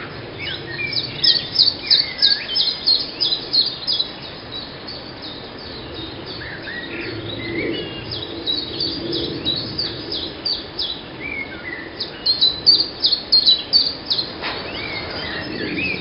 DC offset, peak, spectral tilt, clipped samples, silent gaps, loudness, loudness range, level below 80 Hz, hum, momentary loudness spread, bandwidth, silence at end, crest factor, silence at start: under 0.1%; 0 dBFS; -7 dB/octave; under 0.1%; none; -18 LUFS; 12 LU; -46 dBFS; none; 17 LU; 6 kHz; 0 s; 22 dB; 0 s